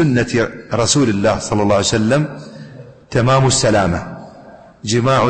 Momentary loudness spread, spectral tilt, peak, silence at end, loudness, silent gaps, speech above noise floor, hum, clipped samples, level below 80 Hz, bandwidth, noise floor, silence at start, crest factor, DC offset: 20 LU; -5 dB/octave; -2 dBFS; 0 s; -15 LUFS; none; 25 dB; none; under 0.1%; -40 dBFS; 8.8 kHz; -40 dBFS; 0 s; 14 dB; under 0.1%